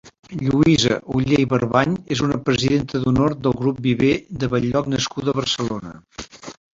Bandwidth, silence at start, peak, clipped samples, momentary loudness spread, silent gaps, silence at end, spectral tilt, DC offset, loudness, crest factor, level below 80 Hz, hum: 7.8 kHz; 0.05 s; -2 dBFS; under 0.1%; 15 LU; 0.19-0.23 s; 0.25 s; -5.5 dB/octave; under 0.1%; -20 LUFS; 18 dB; -44 dBFS; none